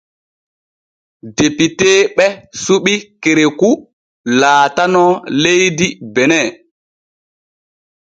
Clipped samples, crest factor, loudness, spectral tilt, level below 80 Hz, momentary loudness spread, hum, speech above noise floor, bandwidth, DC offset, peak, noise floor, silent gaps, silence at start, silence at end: under 0.1%; 14 dB; -12 LUFS; -3.5 dB/octave; -54 dBFS; 7 LU; none; over 78 dB; 9.2 kHz; under 0.1%; 0 dBFS; under -90 dBFS; 3.93-4.24 s; 1.25 s; 1.65 s